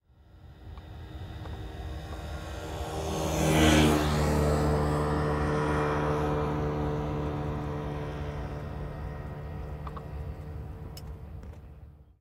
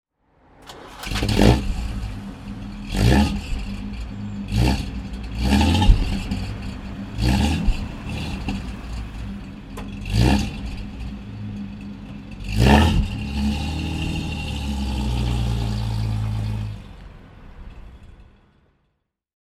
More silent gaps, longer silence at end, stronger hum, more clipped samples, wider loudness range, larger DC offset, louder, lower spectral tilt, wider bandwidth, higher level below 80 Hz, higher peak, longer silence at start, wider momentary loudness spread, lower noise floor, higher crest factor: neither; second, 0.15 s vs 1.2 s; neither; neither; first, 14 LU vs 5 LU; neither; second, -30 LUFS vs -23 LUFS; about the same, -5.5 dB/octave vs -6 dB/octave; first, 16 kHz vs 14.5 kHz; second, -40 dBFS vs -26 dBFS; second, -10 dBFS vs 0 dBFS; second, 0.35 s vs 0.6 s; about the same, 18 LU vs 18 LU; second, -53 dBFS vs -72 dBFS; about the same, 22 dB vs 22 dB